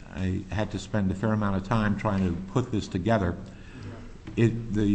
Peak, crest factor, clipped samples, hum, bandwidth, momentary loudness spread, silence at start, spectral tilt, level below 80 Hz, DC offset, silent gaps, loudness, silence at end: -10 dBFS; 18 dB; under 0.1%; none; 8.6 kHz; 16 LU; 0 s; -7.5 dB/octave; -44 dBFS; under 0.1%; none; -28 LUFS; 0 s